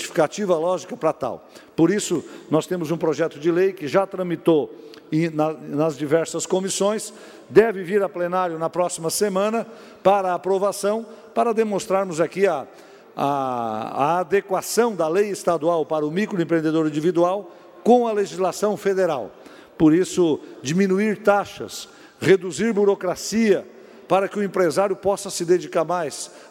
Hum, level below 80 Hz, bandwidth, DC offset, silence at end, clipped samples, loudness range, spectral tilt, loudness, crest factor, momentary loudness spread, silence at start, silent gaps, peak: none; -62 dBFS; 16 kHz; under 0.1%; 0.05 s; under 0.1%; 2 LU; -5 dB/octave; -22 LUFS; 18 dB; 9 LU; 0 s; none; -2 dBFS